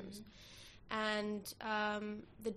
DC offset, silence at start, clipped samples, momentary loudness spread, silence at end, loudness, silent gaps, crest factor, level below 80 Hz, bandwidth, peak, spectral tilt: under 0.1%; 0 s; under 0.1%; 18 LU; 0 s; -40 LUFS; none; 18 dB; -68 dBFS; 14 kHz; -24 dBFS; -4 dB/octave